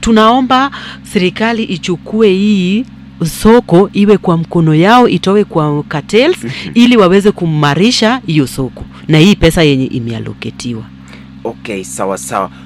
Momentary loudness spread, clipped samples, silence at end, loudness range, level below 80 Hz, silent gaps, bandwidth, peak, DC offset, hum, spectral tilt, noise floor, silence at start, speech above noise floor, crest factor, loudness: 15 LU; 0.8%; 0 s; 4 LU; -34 dBFS; none; 14.5 kHz; 0 dBFS; under 0.1%; none; -6 dB/octave; -32 dBFS; 0 s; 22 dB; 10 dB; -10 LUFS